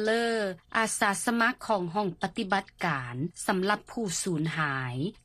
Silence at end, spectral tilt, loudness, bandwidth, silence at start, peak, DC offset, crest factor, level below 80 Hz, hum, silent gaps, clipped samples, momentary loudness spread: 0.15 s; -4 dB/octave; -29 LUFS; 14.5 kHz; 0 s; -10 dBFS; under 0.1%; 18 dB; -62 dBFS; none; none; under 0.1%; 6 LU